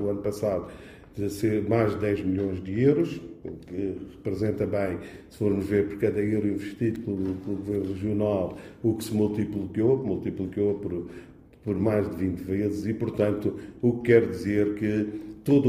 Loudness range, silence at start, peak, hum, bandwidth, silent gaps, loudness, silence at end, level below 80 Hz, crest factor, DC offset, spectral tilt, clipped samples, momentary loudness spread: 3 LU; 0 s; -6 dBFS; none; 15.5 kHz; none; -27 LUFS; 0 s; -54 dBFS; 20 dB; under 0.1%; -8 dB/octave; under 0.1%; 10 LU